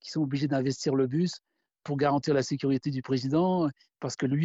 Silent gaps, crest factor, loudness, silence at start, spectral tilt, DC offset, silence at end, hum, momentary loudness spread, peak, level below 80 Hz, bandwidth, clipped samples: none; 16 dB; -28 LUFS; 0.05 s; -6.5 dB/octave; under 0.1%; 0 s; none; 10 LU; -12 dBFS; -66 dBFS; 8 kHz; under 0.1%